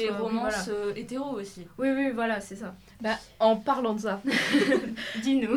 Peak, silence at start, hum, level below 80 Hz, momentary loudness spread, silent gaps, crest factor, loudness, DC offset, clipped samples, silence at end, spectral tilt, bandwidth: -10 dBFS; 0 s; none; -60 dBFS; 11 LU; none; 18 dB; -28 LUFS; under 0.1%; under 0.1%; 0 s; -4.5 dB/octave; 15 kHz